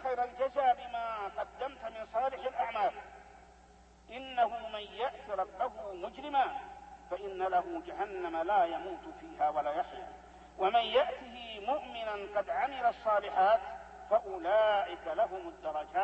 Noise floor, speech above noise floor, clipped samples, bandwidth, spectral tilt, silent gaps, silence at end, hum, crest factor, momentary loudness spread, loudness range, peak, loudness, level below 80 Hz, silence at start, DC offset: -59 dBFS; 27 dB; under 0.1%; 8.4 kHz; -4.5 dB/octave; none; 0 s; none; 18 dB; 15 LU; 6 LU; -16 dBFS; -34 LUFS; -62 dBFS; 0 s; under 0.1%